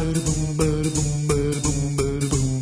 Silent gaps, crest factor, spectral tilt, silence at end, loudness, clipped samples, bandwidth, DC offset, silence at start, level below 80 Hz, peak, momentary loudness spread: none; 14 dB; -5.5 dB/octave; 0 s; -22 LUFS; under 0.1%; 11 kHz; under 0.1%; 0 s; -32 dBFS; -8 dBFS; 2 LU